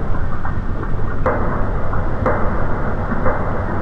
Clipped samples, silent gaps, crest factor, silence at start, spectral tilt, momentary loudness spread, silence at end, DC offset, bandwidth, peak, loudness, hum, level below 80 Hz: under 0.1%; none; 14 dB; 0 s; -9.5 dB/octave; 5 LU; 0 s; 2%; 3.7 kHz; -2 dBFS; -22 LUFS; none; -22 dBFS